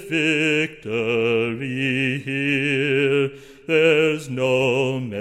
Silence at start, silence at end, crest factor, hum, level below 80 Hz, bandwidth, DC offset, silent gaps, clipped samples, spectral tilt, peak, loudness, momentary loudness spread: 0 s; 0 s; 16 dB; none; -60 dBFS; 14 kHz; under 0.1%; none; under 0.1%; -5.5 dB/octave; -6 dBFS; -20 LUFS; 7 LU